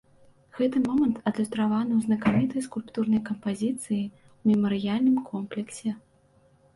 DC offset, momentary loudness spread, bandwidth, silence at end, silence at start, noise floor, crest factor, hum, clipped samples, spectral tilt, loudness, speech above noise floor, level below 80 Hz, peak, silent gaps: under 0.1%; 10 LU; 11.5 kHz; 0.75 s; 0.55 s; -61 dBFS; 16 dB; none; under 0.1%; -6.5 dB/octave; -27 LUFS; 36 dB; -62 dBFS; -10 dBFS; none